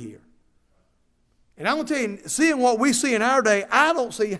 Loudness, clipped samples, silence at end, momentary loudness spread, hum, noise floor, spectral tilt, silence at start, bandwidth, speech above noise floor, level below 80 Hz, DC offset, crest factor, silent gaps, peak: -21 LUFS; under 0.1%; 0 s; 7 LU; none; -65 dBFS; -3 dB/octave; 0 s; 11 kHz; 44 dB; -64 dBFS; under 0.1%; 20 dB; none; -2 dBFS